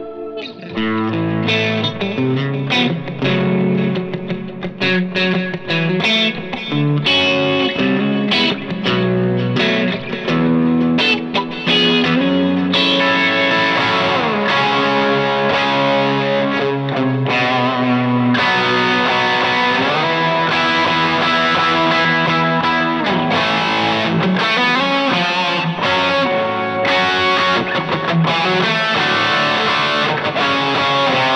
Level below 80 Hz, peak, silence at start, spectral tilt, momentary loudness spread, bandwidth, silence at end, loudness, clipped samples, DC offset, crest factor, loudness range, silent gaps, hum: -54 dBFS; -2 dBFS; 0 s; -5.5 dB/octave; 5 LU; 9.2 kHz; 0 s; -15 LUFS; under 0.1%; under 0.1%; 14 dB; 3 LU; none; none